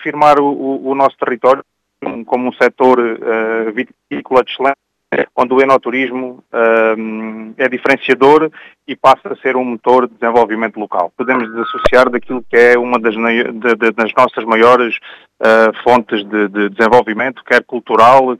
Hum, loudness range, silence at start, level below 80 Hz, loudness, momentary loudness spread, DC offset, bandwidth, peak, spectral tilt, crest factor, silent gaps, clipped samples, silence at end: none; 3 LU; 0 s; -46 dBFS; -13 LUFS; 10 LU; under 0.1%; 11.5 kHz; 0 dBFS; -5.5 dB/octave; 12 dB; none; 0.4%; 0.05 s